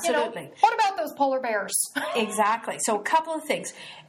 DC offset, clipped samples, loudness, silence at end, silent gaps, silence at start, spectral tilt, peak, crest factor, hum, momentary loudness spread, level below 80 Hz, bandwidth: under 0.1%; under 0.1%; -25 LUFS; 0.05 s; none; 0 s; -2 dB/octave; -4 dBFS; 20 dB; none; 6 LU; -78 dBFS; 16 kHz